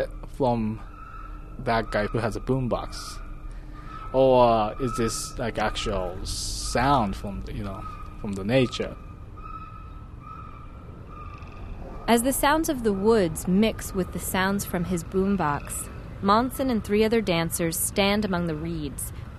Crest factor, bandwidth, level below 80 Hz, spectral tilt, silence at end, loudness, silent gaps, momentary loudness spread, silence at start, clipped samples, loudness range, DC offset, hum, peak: 20 dB; 13 kHz; -38 dBFS; -5 dB/octave; 0 s; -25 LUFS; none; 20 LU; 0 s; under 0.1%; 7 LU; under 0.1%; none; -6 dBFS